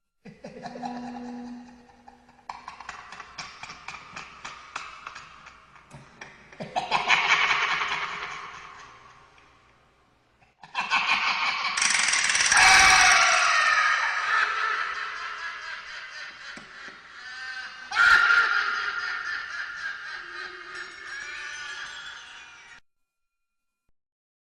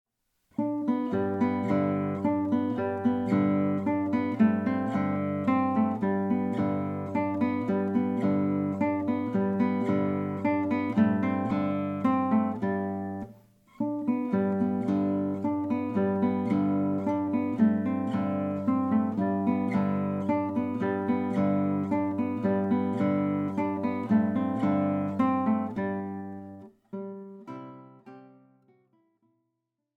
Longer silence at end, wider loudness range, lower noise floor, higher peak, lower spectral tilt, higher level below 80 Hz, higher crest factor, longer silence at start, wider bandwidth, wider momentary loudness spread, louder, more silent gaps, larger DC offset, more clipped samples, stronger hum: about the same, 1.75 s vs 1.7 s; first, 22 LU vs 3 LU; about the same, -79 dBFS vs -82 dBFS; first, -4 dBFS vs -12 dBFS; second, 0.5 dB/octave vs -9.5 dB/octave; first, -58 dBFS vs -70 dBFS; first, 24 dB vs 16 dB; second, 0.25 s vs 0.6 s; first, 16 kHz vs 5 kHz; first, 24 LU vs 7 LU; first, -22 LUFS vs -28 LUFS; neither; neither; neither; neither